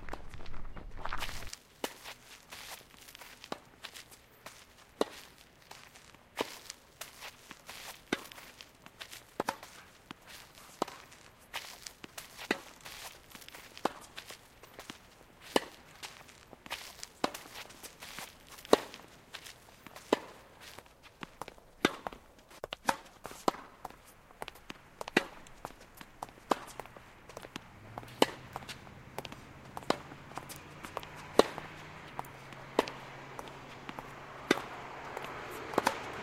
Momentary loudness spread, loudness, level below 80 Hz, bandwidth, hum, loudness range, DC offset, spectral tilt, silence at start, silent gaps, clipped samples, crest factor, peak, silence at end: 19 LU; -39 LUFS; -56 dBFS; 16 kHz; none; 7 LU; under 0.1%; -3.5 dB/octave; 0 s; none; under 0.1%; 34 dB; -6 dBFS; 0 s